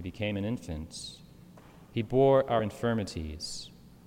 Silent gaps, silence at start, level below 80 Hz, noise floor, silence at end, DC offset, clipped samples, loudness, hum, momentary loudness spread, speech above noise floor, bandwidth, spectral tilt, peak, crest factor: none; 0 s; -54 dBFS; -53 dBFS; 0.1 s; under 0.1%; under 0.1%; -30 LUFS; none; 18 LU; 23 dB; 16 kHz; -6 dB/octave; -14 dBFS; 18 dB